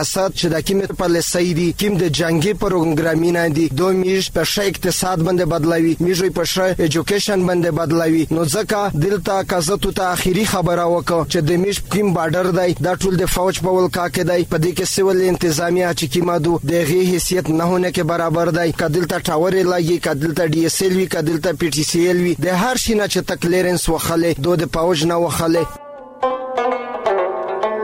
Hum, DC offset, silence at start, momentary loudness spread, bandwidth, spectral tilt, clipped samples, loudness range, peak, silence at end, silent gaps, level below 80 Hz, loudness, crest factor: none; under 0.1%; 0 s; 3 LU; 16.5 kHz; -5 dB/octave; under 0.1%; 1 LU; -6 dBFS; 0 s; none; -38 dBFS; -17 LUFS; 10 dB